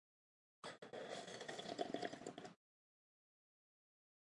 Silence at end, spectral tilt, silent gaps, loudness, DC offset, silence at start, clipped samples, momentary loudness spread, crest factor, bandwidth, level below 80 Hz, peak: 1.7 s; -3.5 dB/octave; none; -51 LUFS; under 0.1%; 0.65 s; under 0.1%; 11 LU; 26 dB; 11.5 kHz; under -90 dBFS; -28 dBFS